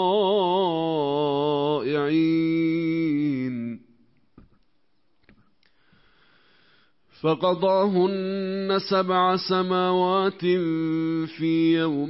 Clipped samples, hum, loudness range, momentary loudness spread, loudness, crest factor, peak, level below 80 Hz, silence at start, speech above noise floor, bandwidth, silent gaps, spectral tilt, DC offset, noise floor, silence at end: under 0.1%; none; 9 LU; 6 LU; -23 LUFS; 14 dB; -10 dBFS; -68 dBFS; 0 s; 49 dB; 5.8 kHz; none; -10 dB/octave; under 0.1%; -72 dBFS; 0 s